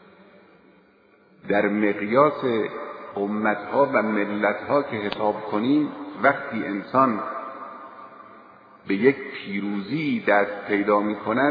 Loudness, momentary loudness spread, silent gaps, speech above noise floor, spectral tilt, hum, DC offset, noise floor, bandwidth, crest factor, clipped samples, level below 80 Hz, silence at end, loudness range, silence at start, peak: -23 LUFS; 12 LU; none; 34 dB; -9 dB/octave; none; under 0.1%; -57 dBFS; 5 kHz; 20 dB; under 0.1%; -68 dBFS; 0 s; 3 LU; 1.45 s; -4 dBFS